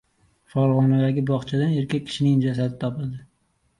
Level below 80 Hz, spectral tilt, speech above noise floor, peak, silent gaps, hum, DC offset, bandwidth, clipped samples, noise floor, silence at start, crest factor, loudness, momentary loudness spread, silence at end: -58 dBFS; -8 dB/octave; 46 dB; -8 dBFS; none; none; under 0.1%; 11 kHz; under 0.1%; -67 dBFS; 0.55 s; 14 dB; -23 LUFS; 11 LU; 0.55 s